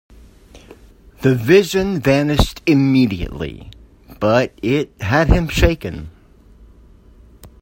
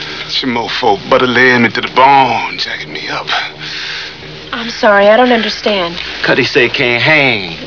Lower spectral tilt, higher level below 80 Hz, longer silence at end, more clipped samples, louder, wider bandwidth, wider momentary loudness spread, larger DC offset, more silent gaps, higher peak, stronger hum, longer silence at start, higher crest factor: first, -6.5 dB/octave vs -4.5 dB/octave; first, -28 dBFS vs -44 dBFS; first, 0.15 s vs 0 s; second, under 0.1% vs 0.4%; second, -16 LUFS vs -11 LUFS; first, 16.5 kHz vs 5.4 kHz; first, 16 LU vs 13 LU; second, under 0.1% vs 0.6%; neither; about the same, 0 dBFS vs 0 dBFS; neither; first, 0.55 s vs 0 s; first, 18 dB vs 12 dB